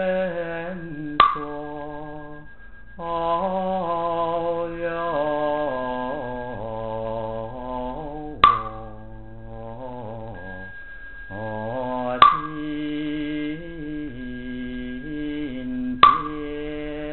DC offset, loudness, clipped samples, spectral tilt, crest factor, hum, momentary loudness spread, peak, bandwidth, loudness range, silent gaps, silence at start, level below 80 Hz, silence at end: 0.9%; -24 LUFS; under 0.1%; -3 dB/octave; 24 dB; none; 20 LU; 0 dBFS; 4.3 kHz; 6 LU; none; 0 s; -44 dBFS; 0 s